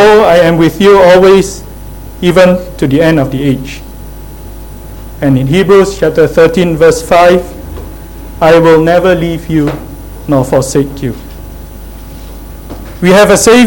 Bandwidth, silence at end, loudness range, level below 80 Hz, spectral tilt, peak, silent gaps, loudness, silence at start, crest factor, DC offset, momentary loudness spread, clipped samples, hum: 19.5 kHz; 0 s; 6 LU; -28 dBFS; -5.5 dB/octave; 0 dBFS; none; -7 LUFS; 0 s; 8 dB; 0.8%; 24 LU; 2%; none